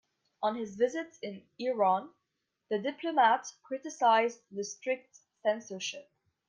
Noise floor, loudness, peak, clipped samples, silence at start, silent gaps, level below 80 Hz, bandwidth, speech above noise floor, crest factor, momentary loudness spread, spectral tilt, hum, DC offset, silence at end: -83 dBFS; -32 LUFS; -14 dBFS; under 0.1%; 0.4 s; none; -84 dBFS; 10 kHz; 52 dB; 18 dB; 14 LU; -3.5 dB/octave; none; under 0.1%; 0.45 s